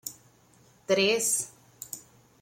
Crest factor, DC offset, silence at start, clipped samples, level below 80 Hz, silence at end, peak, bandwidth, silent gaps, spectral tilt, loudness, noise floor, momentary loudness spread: 20 dB; under 0.1%; 0.05 s; under 0.1%; -74 dBFS; 0.4 s; -12 dBFS; 16.5 kHz; none; -1.5 dB/octave; -25 LUFS; -60 dBFS; 21 LU